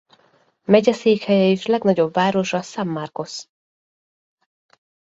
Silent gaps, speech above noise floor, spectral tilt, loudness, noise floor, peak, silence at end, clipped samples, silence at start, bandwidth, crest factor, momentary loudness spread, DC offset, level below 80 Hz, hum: none; 41 dB; -6 dB/octave; -19 LUFS; -59 dBFS; -2 dBFS; 1.7 s; under 0.1%; 0.7 s; 8 kHz; 20 dB; 14 LU; under 0.1%; -64 dBFS; none